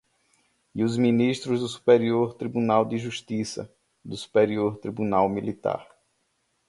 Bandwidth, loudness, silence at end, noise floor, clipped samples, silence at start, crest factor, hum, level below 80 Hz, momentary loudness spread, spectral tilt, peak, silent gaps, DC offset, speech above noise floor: 11.5 kHz; -25 LUFS; 0.85 s; -72 dBFS; under 0.1%; 0.75 s; 20 dB; none; -62 dBFS; 14 LU; -6.5 dB/octave; -6 dBFS; none; under 0.1%; 48 dB